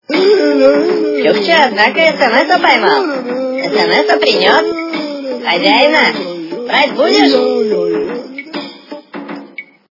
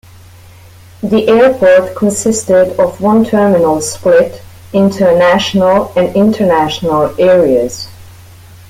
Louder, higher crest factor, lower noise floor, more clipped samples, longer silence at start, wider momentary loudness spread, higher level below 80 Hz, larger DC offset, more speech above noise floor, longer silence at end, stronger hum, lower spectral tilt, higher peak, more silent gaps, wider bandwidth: about the same, -11 LUFS vs -10 LUFS; about the same, 12 dB vs 10 dB; second, -32 dBFS vs -37 dBFS; first, 0.2% vs under 0.1%; second, 0.1 s vs 1 s; first, 17 LU vs 6 LU; second, -60 dBFS vs -44 dBFS; neither; second, 22 dB vs 27 dB; second, 0.3 s vs 0.6 s; neither; about the same, -4 dB/octave vs -5 dB/octave; about the same, 0 dBFS vs 0 dBFS; neither; second, 6 kHz vs 16 kHz